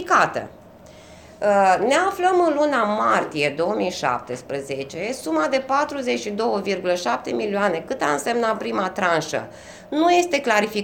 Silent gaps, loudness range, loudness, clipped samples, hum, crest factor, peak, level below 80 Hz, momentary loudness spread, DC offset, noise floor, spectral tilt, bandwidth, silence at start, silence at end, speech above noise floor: none; 4 LU; -21 LUFS; under 0.1%; none; 18 dB; -4 dBFS; -60 dBFS; 10 LU; under 0.1%; -45 dBFS; -4 dB/octave; 18 kHz; 0 s; 0 s; 24 dB